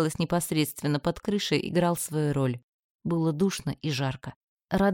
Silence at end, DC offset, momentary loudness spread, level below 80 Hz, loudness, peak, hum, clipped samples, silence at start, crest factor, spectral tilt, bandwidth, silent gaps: 0 s; under 0.1%; 6 LU; -54 dBFS; -28 LUFS; -10 dBFS; none; under 0.1%; 0 s; 18 dB; -5.5 dB/octave; 17.5 kHz; 2.63-2.99 s, 4.36-4.57 s, 4.64-4.68 s